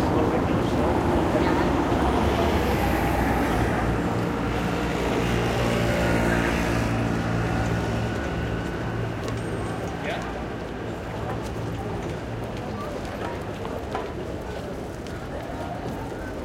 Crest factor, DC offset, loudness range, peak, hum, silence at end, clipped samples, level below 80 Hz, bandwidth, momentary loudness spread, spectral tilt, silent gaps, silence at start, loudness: 16 dB; under 0.1%; 9 LU; -10 dBFS; none; 0 s; under 0.1%; -36 dBFS; 16.5 kHz; 10 LU; -6.5 dB/octave; none; 0 s; -26 LUFS